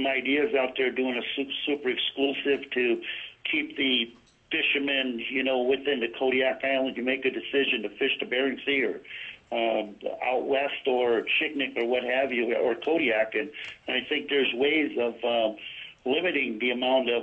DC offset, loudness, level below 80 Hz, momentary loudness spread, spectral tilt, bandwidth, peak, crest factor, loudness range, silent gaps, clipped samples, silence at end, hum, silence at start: under 0.1%; -26 LUFS; -68 dBFS; 6 LU; -5.5 dB/octave; 6.2 kHz; -12 dBFS; 16 dB; 2 LU; none; under 0.1%; 0 s; none; 0 s